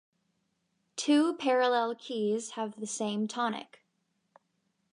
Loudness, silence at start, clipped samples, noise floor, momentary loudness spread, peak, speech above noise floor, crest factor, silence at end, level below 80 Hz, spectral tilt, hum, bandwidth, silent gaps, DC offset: -30 LUFS; 0.95 s; under 0.1%; -78 dBFS; 11 LU; -16 dBFS; 48 dB; 16 dB; 1.3 s; -88 dBFS; -3.5 dB/octave; none; 11 kHz; none; under 0.1%